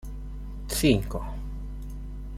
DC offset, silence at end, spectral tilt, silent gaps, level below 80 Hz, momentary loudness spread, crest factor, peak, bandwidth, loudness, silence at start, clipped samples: under 0.1%; 0 s; -5 dB/octave; none; -36 dBFS; 17 LU; 22 dB; -8 dBFS; 16 kHz; -28 LUFS; 0 s; under 0.1%